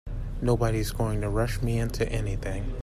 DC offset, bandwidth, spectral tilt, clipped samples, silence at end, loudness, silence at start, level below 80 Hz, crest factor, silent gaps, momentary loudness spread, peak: under 0.1%; 15 kHz; -6.5 dB/octave; under 0.1%; 0 s; -28 LUFS; 0.05 s; -32 dBFS; 16 dB; none; 7 LU; -12 dBFS